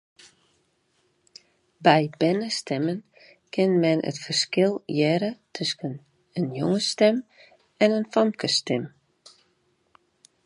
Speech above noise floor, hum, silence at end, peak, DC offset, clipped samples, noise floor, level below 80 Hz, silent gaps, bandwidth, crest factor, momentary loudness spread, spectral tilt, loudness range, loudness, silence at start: 45 dB; none; 1.55 s; -2 dBFS; under 0.1%; under 0.1%; -69 dBFS; -72 dBFS; none; 11.5 kHz; 24 dB; 11 LU; -5 dB/octave; 2 LU; -24 LUFS; 1.8 s